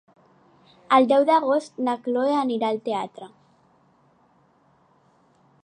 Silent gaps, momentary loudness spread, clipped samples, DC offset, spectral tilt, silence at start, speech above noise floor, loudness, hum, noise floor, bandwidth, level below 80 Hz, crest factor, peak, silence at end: none; 12 LU; under 0.1%; under 0.1%; -5 dB/octave; 0.9 s; 39 dB; -22 LUFS; none; -61 dBFS; 10 kHz; -80 dBFS; 20 dB; -4 dBFS; 2.4 s